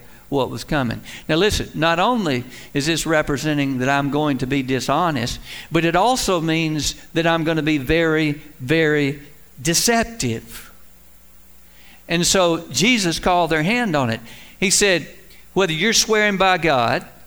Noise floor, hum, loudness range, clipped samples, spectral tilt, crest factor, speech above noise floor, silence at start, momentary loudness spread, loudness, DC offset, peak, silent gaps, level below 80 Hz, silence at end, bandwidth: -48 dBFS; none; 3 LU; under 0.1%; -3.5 dB/octave; 16 dB; 29 dB; 0.3 s; 10 LU; -19 LUFS; 0.5%; -2 dBFS; none; -40 dBFS; 0.2 s; over 20 kHz